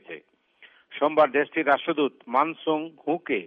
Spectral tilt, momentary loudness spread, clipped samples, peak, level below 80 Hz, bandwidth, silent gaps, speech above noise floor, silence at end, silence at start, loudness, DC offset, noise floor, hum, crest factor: -7.5 dB/octave; 13 LU; under 0.1%; -8 dBFS; -78 dBFS; 5.2 kHz; none; 32 dB; 0 s; 0.1 s; -24 LUFS; under 0.1%; -57 dBFS; none; 18 dB